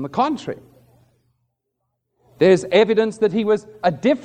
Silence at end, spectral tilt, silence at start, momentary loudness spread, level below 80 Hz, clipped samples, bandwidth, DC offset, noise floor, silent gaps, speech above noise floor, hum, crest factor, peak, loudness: 0 s; -6 dB/octave; 0 s; 11 LU; -64 dBFS; under 0.1%; 9.8 kHz; under 0.1%; -76 dBFS; none; 58 dB; none; 18 dB; -2 dBFS; -18 LUFS